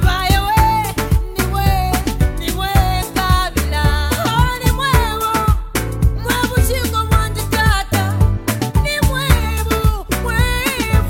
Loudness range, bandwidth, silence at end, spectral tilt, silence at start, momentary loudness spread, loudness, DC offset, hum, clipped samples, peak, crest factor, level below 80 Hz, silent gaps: 1 LU; 17 kHz; 0 s; -5 dB/octave; 0 s; 4 LU; -16 LUFS; under 0.1%; none; under 0.1%; 0 dBFS; 16 dB; -20 dBFS; none